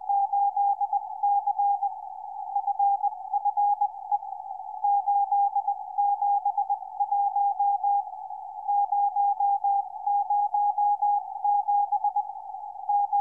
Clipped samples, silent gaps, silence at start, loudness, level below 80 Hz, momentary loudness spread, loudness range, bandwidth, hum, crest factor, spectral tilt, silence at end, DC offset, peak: under 0.1%; none; 0 s; -26 LUFS; -76 dBFS; 11 LU; 2 LU; 1.1 kHz; none; 10 dB; -5 dB/octave; 0 s; under 0.1%; -16 dBFS